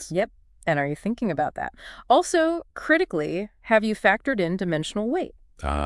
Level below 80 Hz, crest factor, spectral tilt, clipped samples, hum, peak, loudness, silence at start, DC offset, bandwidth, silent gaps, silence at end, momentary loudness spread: -44 dBFS; 20 dB; -5 dB/octave; under 0.1%; none; -4 dBFS; -24 LUFS; 0 s; under 0.1%; 12 kHz; none; 0 s; 11 LU